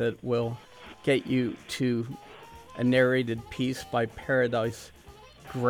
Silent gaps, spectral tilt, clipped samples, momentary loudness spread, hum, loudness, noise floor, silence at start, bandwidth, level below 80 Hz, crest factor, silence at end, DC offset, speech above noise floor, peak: none; -6 dB/octave; under 0.1%; 20 LU; none; -28 LUFS; -51 dBFS; 0 s; 16 kHz; -58 dBFS; 18 dB; 0 s; under 0.1%; 23 dB; -10 dBFS